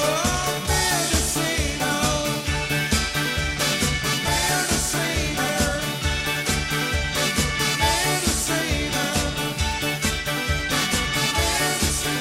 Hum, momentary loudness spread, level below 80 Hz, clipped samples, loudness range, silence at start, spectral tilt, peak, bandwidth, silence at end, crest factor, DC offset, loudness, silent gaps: none; 3 LU; -32 dBFS; under 0.1%; 1 LU; 0 s; -3 dB/octave; -8 dBFS; 16.5 kHz; 0 s; 16 dB; under 0.1%; -22 LUFS; none